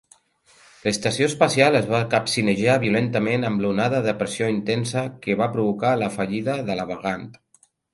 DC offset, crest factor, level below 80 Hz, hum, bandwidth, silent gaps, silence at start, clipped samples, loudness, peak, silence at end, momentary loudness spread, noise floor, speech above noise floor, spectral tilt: under 0.1%; 22 dB; -56 dBFS; none; 11.5 kHz; none; 0.85 s; under 0.1%; -22 LUFS; -2 dBFS; 0.6 s; 9 LU; -61 dBFS; 39 dB; -5 dB/octave